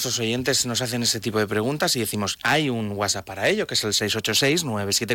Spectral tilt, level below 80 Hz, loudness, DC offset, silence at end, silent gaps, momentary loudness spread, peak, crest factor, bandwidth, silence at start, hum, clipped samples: -3 dB/octave; -58 dBFS; -22 LUFS; under 0.1%; 0 s; none; 4 LU; -10 dBFS; 12 dB; 18 kHz; 0 s; none; under 0.1%